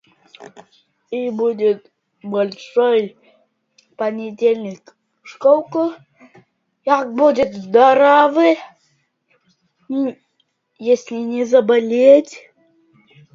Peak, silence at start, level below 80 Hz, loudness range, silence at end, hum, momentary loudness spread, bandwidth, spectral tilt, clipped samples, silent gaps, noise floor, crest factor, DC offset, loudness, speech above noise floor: 0 dBFS; 0.4 s; -64 dBFS; 6 LU; 0.95 s; none; 15 LU; 7.6 kHz; -5.5 dB/octave; under 0.1%; none; -67 dBFS; 18 dB; under 0.1%; -16 LUFS; 51 dB